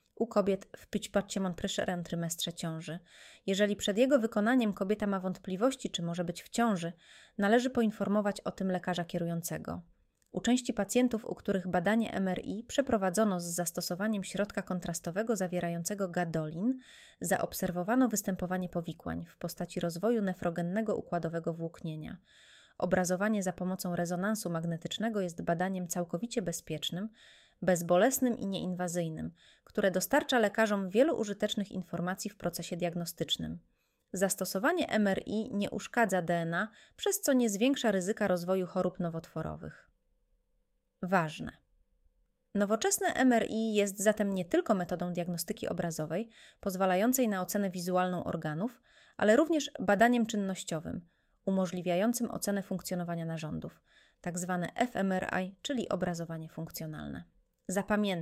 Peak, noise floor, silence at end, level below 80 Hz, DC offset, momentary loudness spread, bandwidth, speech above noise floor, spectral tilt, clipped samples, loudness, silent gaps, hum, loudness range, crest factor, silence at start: -12 dBFS; -77 dBFS; 0 s; -64 dBFS; under 0.1%; 12 LU; 16 kHz; 45 dB; -5 dB/octave; under 0.1%; -32 LUFS; none; none; 5 LU; 22 dB; 0.2 s